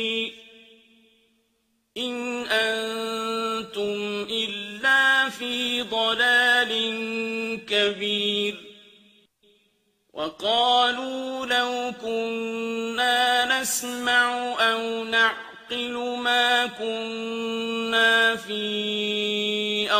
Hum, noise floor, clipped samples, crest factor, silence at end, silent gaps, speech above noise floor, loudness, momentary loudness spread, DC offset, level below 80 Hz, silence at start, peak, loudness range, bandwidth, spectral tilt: none; -71 dBFS; under 0.1%; 18 dB; 0 s; none; 47 dB; -23 LUFS; 11 LU; under 0.1%; -68 dBFS; 0 s; -6 dBFS; 6 LU; 15.5 kHz; -1.5 dB/octave